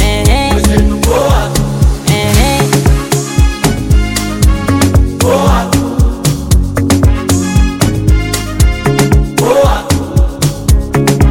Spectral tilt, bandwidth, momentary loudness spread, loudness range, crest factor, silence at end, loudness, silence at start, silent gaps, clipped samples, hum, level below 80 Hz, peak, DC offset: -5.5 dB/octave; 17 kHz; 3 LU; 1 LU; 10 dB; 0 s; -11 LUFS; 0 s; none; under 0.1%; none; -14 dBFS; 0 dBFS; under 0.1%